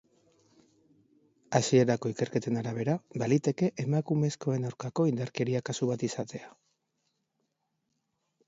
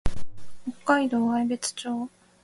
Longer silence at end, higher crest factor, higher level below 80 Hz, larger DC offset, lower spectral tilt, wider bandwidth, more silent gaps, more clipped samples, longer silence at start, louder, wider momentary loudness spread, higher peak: first, 2 s vs 0.35 s; about the same, 22 dB vs 18 dB; second, -72 dBFS vs -40 dBFS; neither; first, -6 dB/octave vs -4 dB/octave; second, 8 kHz vs 11.5 kHz; neither; neither; first, 1.5 s vs 0.05 s; second, -30 LUFS vs -26 LUFS; second, 8 LU vs 16 LU; about the same, -8 dBFS vs -8 dBFS